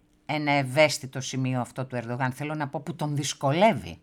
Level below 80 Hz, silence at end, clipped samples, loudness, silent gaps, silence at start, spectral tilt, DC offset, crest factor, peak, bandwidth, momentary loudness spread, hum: -62 dBFS; 0.05 s; under 0.1%; -26 LUFS; none; 0.3 s; -5 dB/octave; under 0.1%; 22 dB; -6 dBFS; 16.5 kHz; 10 LU; none